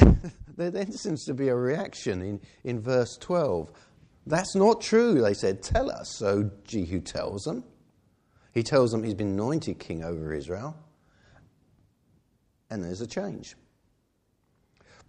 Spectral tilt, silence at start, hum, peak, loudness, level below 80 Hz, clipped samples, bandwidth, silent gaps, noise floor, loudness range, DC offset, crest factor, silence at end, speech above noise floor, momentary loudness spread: -6.5 dB/octave; 0 s; none; 0 dBFS; -28 LUFS; -38 dBFS; under 0.1%; 10.5 kHz; none; -71 dBFS; 15 LU; under 0.1%; 28 dB; 1.55 s; 44 dB; 14 LU